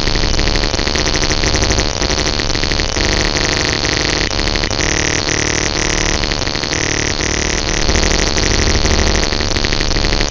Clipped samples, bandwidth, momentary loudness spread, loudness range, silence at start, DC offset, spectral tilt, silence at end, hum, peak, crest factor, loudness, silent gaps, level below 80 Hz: 0.1%; 8 kHz; 2 LU; 1 LU; 0 s; 0.6%; -3 dB/octave; 0 s; none; 0 dBFS; 14 dB; -14 LUFS; none; -20 dBFS